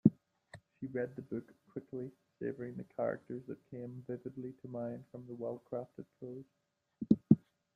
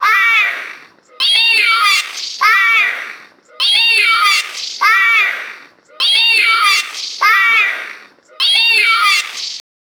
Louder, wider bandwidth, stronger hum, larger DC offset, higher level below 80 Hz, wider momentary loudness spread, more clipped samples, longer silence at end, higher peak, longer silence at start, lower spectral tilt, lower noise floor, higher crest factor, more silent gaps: second, -39 LUFS vs -10 LUFS; second, 4.5 kHz vs over 20 kHz; neither; neither; about the same, -72 dBFS vs -72 dBFS; first, 18 LU vs 15 LU; neither; about the same, 0.4 s vs 0.4 s; second, -10 dBFS vs 0 dBFS; about the same, 0.05 s vs 0 s; first, -11 dB/octave vs 4 dB/octave; first, -60 dBFS vs -38 dBFS; first, 28 dB vs 14 dB; neither